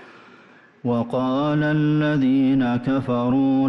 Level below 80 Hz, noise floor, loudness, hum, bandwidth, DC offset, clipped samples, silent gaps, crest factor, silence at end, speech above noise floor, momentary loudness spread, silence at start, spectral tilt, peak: -54 dBFS; -50 dBFS; -21 LUFS; none; 6 kHz; under 0.1%; under 0.1%; none; 8 dB; 0 s; 31 dB; 5 LU; 0 s; -9 dB/octave; -12 dBFS